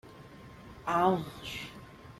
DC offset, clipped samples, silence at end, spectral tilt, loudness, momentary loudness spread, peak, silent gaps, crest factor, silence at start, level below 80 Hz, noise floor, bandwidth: under 0.1%; under 0.1%; 0 s; -6 dB/octave; -32 LUFS; 23 LU; -14 dBFS; none; 20 dB; 0.05 s; -60 dBFS; -51 dBFS; 16 kHz